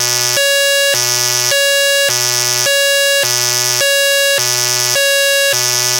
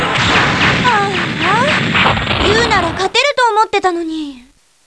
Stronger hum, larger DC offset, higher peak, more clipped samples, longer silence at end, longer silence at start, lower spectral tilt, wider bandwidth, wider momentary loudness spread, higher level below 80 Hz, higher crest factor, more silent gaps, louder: neither; second, under 0.1% vs 0.1%; about the same, 0 dBFS vs 0 dBFS; first, 1% vs under 0.1%; second, 0 s vs 0.45 s; about the same, 0 s vs 0 s; second, 0 dB/octave vs -4 dB/octave; first, over 20 kHz vs 11 kHz; second, 1 LU vs 6 LU; second, -64 dBFS vs -34 dBFS; about the same, 12 dB vs 14 dB; neither; about the same, -11 LUFS vs -12 LUFS